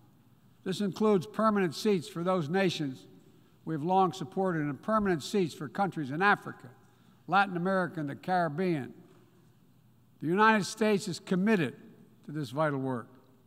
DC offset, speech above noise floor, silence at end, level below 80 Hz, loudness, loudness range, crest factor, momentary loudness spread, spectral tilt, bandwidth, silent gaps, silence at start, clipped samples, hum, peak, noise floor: under 0.1%; 33 dB; 0.4 s; -70 dBFS; -30 LUFS; 2 LU; 20 dB; 12 LU; -6 dB/octave; 15.5 kHz; none; 0.65 s; under 0.1%; none; -12 dBFS; -63 dBFS